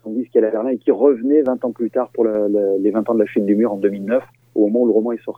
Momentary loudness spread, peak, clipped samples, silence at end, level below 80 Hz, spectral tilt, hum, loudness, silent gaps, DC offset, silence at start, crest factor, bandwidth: 6 LU; -2 dBFS; under 0.1%; 0.05 s; -70 dBFS; -10 dB/octave; none; -18 LUFS; none; under 0.1%; 0.05 s; 16 dB; 3.7 kHz